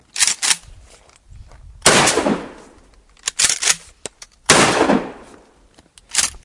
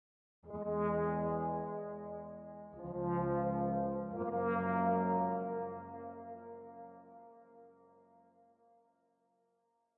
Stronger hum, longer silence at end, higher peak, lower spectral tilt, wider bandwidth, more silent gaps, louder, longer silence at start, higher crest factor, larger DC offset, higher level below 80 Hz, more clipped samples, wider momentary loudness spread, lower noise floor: neither; second, 0.05 s vs 2.25 s; first, 0 dBFS vs -22 dBFS; second, -1.5 dB/octave vs -9.5 dB/octave; first, 12 kHz vs 3.7 kHz; neither; first, -16 LUFS vs -37 LUFS; second, 0.15 s vs 0.45 s; about the same, 20 dB vs 16 dB; neither; first, -46 dBFS vs -66 dBFS; neither; first, 22 LU vs 18 LU; second, -51 dBFS vs -80 dBFS